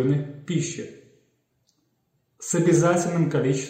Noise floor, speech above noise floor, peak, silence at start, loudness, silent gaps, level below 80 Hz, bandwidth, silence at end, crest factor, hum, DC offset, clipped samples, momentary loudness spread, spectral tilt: -71 dBFS; 49 dB; -8 dBFS; 0 s; -23 LUFS; none; -62 dBFS; 15.5 kHz; 0 s; 16 dB; none; under 0.1%; under 0.1%; 17 LU; -6 dB/octave